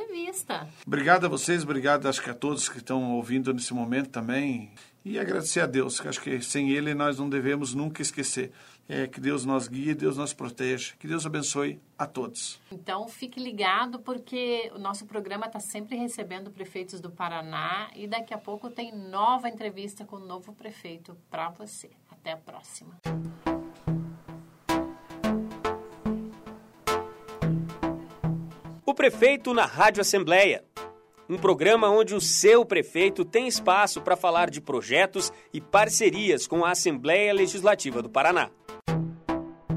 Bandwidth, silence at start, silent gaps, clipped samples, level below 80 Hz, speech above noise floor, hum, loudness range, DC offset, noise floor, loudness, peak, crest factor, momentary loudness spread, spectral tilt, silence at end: 16 kHz; 0 s; none; under 0.1%; -58 dBFS; 20 dB; none; 12 LU; under 0.1%; -47 dBFS; -26 LUFS; -4 dBFS; 22 dB; 18 LU; -3.5 dB/octave; 0 s